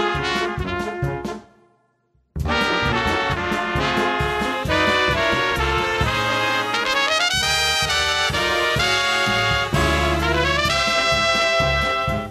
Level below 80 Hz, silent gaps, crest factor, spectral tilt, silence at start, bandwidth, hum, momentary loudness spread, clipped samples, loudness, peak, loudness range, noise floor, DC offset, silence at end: -34 dBFS; none; 14 dB; -3.5 dB/octave; 0 s; 13.5 kHz; none; 7 LU; under 0.1%; -19 LUFS; -6 dBFS; 5 LU; -64 dBFS; under 0.1%; 0 s